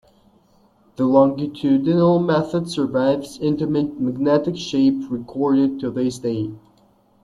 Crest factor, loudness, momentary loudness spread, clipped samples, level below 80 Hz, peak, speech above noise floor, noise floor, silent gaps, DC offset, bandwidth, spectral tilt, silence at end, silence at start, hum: 18 dB; -20 LUFS; 8 LU; under 0.1%; -56 dBFS; -2 dBFS; 38 dB; -57 dBFS; none; under 0.1%; 11.5 kHz; -7.5 dB/octave; 0.65 s; 1 s; none